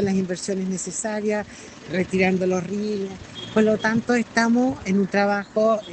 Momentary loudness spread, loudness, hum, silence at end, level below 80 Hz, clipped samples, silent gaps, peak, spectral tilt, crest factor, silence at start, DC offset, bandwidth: 9 LU; -23 LUFS; none; 0 s; -56 dBFS; under 0.1%; none; -6 dBFS; -5.5 dB/octave; 16 dB; 0 s; under 0.1%; 9 kHz